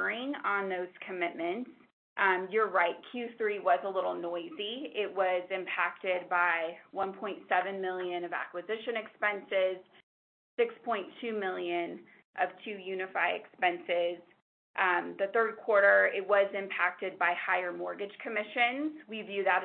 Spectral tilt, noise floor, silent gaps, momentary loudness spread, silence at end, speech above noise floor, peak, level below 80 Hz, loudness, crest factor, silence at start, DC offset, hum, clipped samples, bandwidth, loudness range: -7.5 dB/octave; under -90 dBFS; 1.93-2.16 s, 10.03-10.57 s, 12.25-12.34 s, 14.42-14.74 s; 10 LU; 0 s; over 58 dB; -12 dBFS; -86 dBFS; -32 LUFS; 20 dB; 0 s; under 0.1%; none; under 0.1%; 4.4 kHz; 6 LU